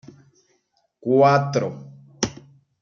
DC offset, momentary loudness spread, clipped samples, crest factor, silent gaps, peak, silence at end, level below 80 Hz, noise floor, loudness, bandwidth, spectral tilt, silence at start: under 0.1%; 16 LU; under 0.1%; 20 dB; none; -4 dBFS; 0.5 s; -58 dBFS; -68 dBFS; -21 LUFS; 7.4 kHz; -5.5 dB/octave; 1.05 s